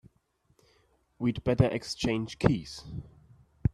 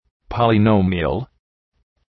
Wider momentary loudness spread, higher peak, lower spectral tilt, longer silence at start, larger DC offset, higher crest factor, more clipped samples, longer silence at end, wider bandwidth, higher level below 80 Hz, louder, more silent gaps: about the same, 15 LU vs 15 LU; second, -8 dBFS vs -2 dBFS; second, -6.5 dB/octave vs -10 dB/octave; first, 1.2 s vs 0.3 s; neither; first, 24 dB vs 16 dB; neither; second, 0.05 s vs 0.85 s; first, 12 kHz vs 5.6 kHz; second, -48 dBFS vs -40 dBFS; second, -30 LUFS vs -18 LUFS; neither